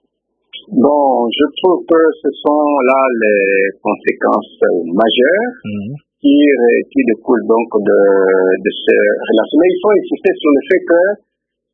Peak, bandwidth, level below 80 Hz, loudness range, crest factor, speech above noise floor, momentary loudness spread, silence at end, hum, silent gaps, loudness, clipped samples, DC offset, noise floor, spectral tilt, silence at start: 0 dBFS; 3.8 kHz; -60 dBFS; 1 LU; 12 dB; 55 dB; 6 LU; 0.6 s; none; none; -12 LUFS; under 0.1%; under 0.1%; -67 dBFS; -8 dB/octave; 0.55 s